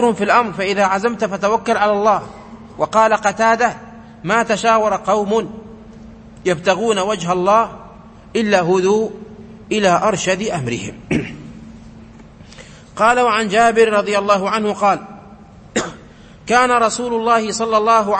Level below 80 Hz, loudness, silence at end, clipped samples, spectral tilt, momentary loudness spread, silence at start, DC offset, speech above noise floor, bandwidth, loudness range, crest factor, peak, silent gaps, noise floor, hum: -48 dBFS; -16 LUFS; 0 s; under 0.1%; -4 dB/octave; 16 LU; 0 s; under 0.1%; 25 dB; 8.8 kHz; 4 LU; 16 dB; 0 dBFS; none; -41 dBFS; none